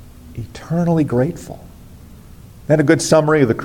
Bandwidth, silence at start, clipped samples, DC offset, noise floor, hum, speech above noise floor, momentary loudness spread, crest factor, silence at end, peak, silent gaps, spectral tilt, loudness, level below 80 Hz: 17 kHz; 0 s; under 0.1%; under 0.1%; -39 dBFS; none; 24 dB; 22 LU; 16 dB; 0 s; -2 dBFS; none; -6 dB/octave; -16 LUFS; -44 dBFS